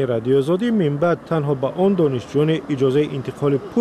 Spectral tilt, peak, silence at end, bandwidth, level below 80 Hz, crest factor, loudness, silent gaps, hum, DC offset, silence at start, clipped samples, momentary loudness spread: -8 dB/octave; -8 dBFS; 0 s; 12 kHz; -54 dBFS; 12 dB; -19 LUFS; none; none; under 0.1%; 0 s; under 0.1%; 4 LU